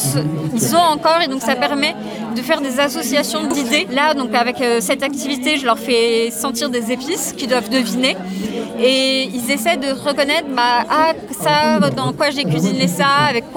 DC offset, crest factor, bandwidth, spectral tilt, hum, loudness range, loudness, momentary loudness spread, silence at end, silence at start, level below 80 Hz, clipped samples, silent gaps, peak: under 0.1%; 16 dB; 19 kHz; -3.5 dB/octave; none; 2 LU; -16 LUFS; 6 LU; 0 s; 0 s; -54 dBFS; under 0.1%; none; -2 dBFS